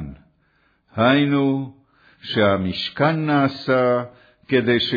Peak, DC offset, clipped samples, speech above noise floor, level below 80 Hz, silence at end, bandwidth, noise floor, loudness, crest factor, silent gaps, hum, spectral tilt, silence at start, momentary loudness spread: -6 dBFS; under 0.1%; under 0.1%; 44 dB; -54 dBFS; 0 s; 5 kHz; -63 dBFS; -20 LUFS; 16 dB; none; none; -8 dB/octave; 0 s; 17 LU